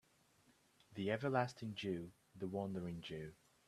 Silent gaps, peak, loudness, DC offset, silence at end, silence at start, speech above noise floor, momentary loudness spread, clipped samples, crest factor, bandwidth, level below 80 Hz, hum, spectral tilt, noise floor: none; -20 dBFS; -43 LUFS; under 0.1%; 0.35 s; 0.9 s; 31 dB; 14 LU; under 0.1%; 24 dB; 14 kHz; -76 dBFS; none; -6.5 dB/octave; -73 dBFS